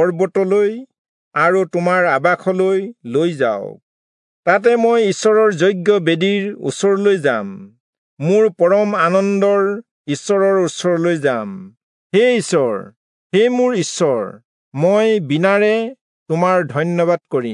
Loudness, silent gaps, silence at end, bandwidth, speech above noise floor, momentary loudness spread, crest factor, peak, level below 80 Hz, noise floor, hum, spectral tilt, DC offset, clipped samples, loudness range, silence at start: -16 LUFS; 0.98-1.31 s, 3.83-4.43 s, 7.80-8.17 s, 9.91-10.05 s, 11.83-12.10 s, 12.96-13.30 s, 14.45-14.72 s, 16.01-16.26 s; 0 s; 11 kHz; over 75 dB; 10 LU; 16 dB; 0 dBFS; -72 dBFS; under -90 dBFS; none; -5.5 dB/octave; under 0.1%; under 0.1%; 2 LU; 0 s